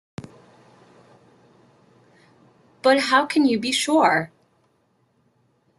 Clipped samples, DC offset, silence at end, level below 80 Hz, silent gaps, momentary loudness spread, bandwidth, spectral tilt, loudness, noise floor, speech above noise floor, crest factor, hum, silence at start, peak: under 0.1%; under 0.1%; 1.55 s; -68 dBFS; none; 20 LU; 12.5 kHz; -3.5 dB/octave; -19 LUFS; -66 dBFS; 47 dB; 20 dB; none; 0.2 s; -4 dBFS